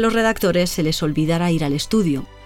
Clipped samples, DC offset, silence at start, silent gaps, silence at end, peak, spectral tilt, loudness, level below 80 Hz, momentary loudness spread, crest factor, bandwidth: under 0.1%; under 0.1%; 0 s; none; 0 s; -4 dBFS; -5.5 dB/octave; -19 LUFS; -38 dBFS; 3 LU; 14 dB; 17 kHz